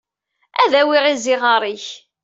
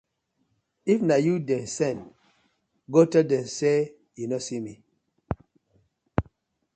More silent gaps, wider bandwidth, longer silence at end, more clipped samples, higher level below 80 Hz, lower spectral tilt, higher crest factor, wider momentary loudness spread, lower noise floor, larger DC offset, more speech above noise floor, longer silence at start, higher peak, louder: neither; second, 8 kHz vs 9.2 kHz; second, 0.25 s vs 0.55 s; neither; second, -72 dBFS vs -52 dBFS; second, -1.5 dB/octave vs -6 dB/octave; second, 16 dB vs 22 dB; about the same, 14 LU vs 16 LU; second, -68 dBFS vs -74 dBFS; neither; about the same, 52 dB vs 50 dB; second, 0.55 s vs 0.85 s; first, -2 dBFS vs -6 dBFS; first, -16 LUFS vs -25 LUFS